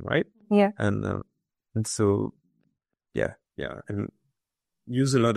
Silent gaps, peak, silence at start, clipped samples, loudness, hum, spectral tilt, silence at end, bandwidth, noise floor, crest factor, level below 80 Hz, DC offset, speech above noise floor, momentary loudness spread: none; -8 dBFS; 0 s; under 0.1%; -28 LUFS; none; -6 dB/octave; 0 s; 13.5 kHz; -85 dBFS; 20 dB; -58 dBFS; under 0.1%; 60 dB; 13 LU